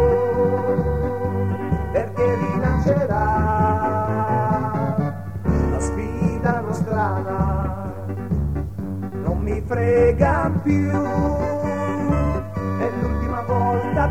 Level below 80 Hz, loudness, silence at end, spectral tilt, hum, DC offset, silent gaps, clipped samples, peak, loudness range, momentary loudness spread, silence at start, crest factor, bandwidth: -30 dBFS; -21 LUFS; 0 s; -8.5 dB/octave; none; 1%; none; under 0.1%; -4 dBFS; 3 LU; 7 LU; 0 s; 16 dB; 14 kHz